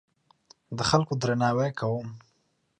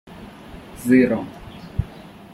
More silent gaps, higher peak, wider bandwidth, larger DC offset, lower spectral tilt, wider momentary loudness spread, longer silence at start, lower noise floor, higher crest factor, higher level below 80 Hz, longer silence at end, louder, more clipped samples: neither; about the same, -6 dBFS vs -4 dBFS; second, 10.5 kHz vs 14.5 kHz; neither; second, -5.5 dB/octave vs -7 dB/octave; second, 12 LU vs 24 LU; first, 0.7 s vs 0.1 s; first, -72 dBFS vs -41 dBFS; about the same, 22 dB vs 20 dB; second, -56 dBFS vs -40 dBFS; first, 0.6 s vs 0.35 s; second, -27 LUFS vs -21 LUFS; neither